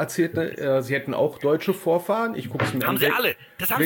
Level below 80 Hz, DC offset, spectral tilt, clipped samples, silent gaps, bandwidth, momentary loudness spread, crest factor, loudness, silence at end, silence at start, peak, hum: -62 dBFS; under 0.1%; -5 dB/octave; under 0.1%; none; 17 kHz; 6 LU; 16 dB; -23 LUFS; 0 s; 0 s; -6 dBFS; none